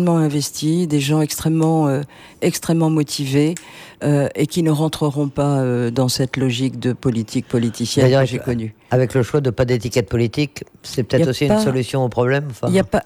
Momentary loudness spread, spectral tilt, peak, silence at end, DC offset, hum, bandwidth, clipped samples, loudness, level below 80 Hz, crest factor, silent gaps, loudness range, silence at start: 6 LU; -6 dB/octave; -2 dBFS; 0.05 s; under 0.1%; none; 16 kHz; under 0.1%; -18 LUFS; -46 dBFS; 16 dB; none; 1 LU; 0 s